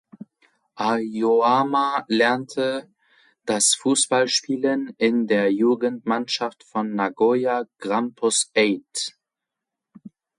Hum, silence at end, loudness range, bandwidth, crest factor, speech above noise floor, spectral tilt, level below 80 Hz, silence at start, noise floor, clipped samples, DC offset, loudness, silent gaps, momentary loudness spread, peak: none; 0.3 s; 3 LU; 11.5 kHz; 18 dB; 64 dB; -2.5 dB/octave; -72 dBFS; 0.75 s; -86 dBFS; under 0.1%; under 0.1%; -21 LUFS; none; 9 LU; -6 dBFS